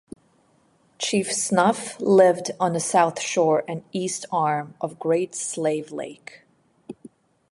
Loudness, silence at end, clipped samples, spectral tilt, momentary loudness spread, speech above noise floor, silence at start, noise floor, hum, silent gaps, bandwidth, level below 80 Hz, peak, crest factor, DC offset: -22 LUFS; 0.6 s; under 0.1%; -4 dB/octave; 16 LU; 39 dB; 1 s; -62 dBFS; none; none; 11.5 kHz; -70 dBFS; -4 dBFS; 20 dB; under 0.1%